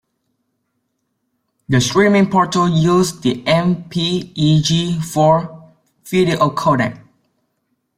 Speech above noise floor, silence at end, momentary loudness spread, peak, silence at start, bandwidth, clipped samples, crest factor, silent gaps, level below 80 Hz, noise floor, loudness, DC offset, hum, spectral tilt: 56 dB; 1 s; 7 LU; -2 dBFS; 1.7 s; 15.5 kHz; under 0.1%; 16 dB; none; -50 dBFS; -71 dBFS; -16 LUFS; under 0.1%; none; -5.5 dB/octave